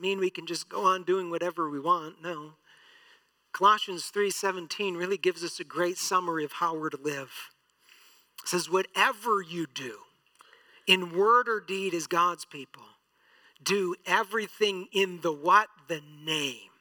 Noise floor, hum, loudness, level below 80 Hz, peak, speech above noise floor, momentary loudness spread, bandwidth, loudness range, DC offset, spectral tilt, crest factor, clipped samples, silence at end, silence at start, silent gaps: -65 dBFS; none; -28 LUFS; under -90 dBFS; -6 dBFS; 36 dB; 15 LU; 19 kHz; 4 LU; under 0.1%; -3 dB/octave; 24 dB; under 0.1%; 0.15 s; 0 s; none